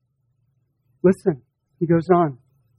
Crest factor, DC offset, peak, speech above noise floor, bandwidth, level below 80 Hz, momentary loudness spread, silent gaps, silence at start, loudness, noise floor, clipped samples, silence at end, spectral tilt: 18 dB; under 0.1%; -4 dBFS; 49 dB; 11 kHz; -58 dBFS; 10 LU; none; 1.05 s; -20 LUFS; -68 dBFS; under 0.1%; 0.45 s; -9.5 dB/octave